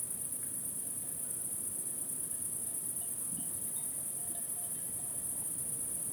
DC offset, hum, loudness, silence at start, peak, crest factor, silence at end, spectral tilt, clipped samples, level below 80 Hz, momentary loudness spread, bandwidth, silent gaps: under 0.1%; none; -35 LUFS; 0 s; -24 dBFS; 14 dB; 0 s; -2 dB/octave; under 0.1%; -70 dBFS; 1 LU; over 20 kHz; none